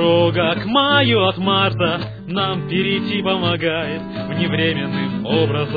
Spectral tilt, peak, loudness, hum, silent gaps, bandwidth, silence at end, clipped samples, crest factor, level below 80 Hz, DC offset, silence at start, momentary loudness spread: -8.5 dB/octave; -2 dBFS; -18 LUFS; none; none; 4.9 kHz; 0 s; under 0.1%; 16 dB; -48 dBFS; under 0.1%; 0 s; 8 LU